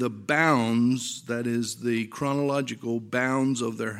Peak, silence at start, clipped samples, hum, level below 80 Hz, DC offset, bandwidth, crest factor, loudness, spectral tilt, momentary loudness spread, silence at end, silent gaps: -6 dBFS; 0 s; under 0.1%; none; -70 dBFS; under 0.1%; 15 kHz; 18 dB; -26 LUFS; -5 dB/octave; 8 LU; 0 s; none